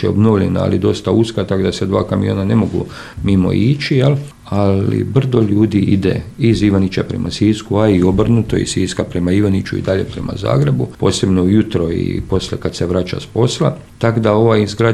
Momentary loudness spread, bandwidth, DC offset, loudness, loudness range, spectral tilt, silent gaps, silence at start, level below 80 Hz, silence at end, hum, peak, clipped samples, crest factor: 6 LU; 12.5 kHz; under 0.1%; -15 LUFS; 2 LU; -7 dB/octave; none; 0 s; -36 dBFS; 0 s; none; 0 dBFS; under 0.1%; 14 dB